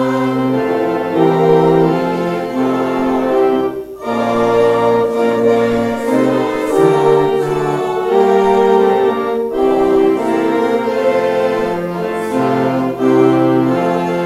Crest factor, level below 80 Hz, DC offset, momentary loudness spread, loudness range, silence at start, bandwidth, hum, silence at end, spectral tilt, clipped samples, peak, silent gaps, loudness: 14 dB; -46 dBFS; under 0.1%; 6 LU; 2 LU; 0 s; 14 kHz; none; 0 s; -7 dB/octave; under 0.1%; 0 dBFS; none; -14 LUFS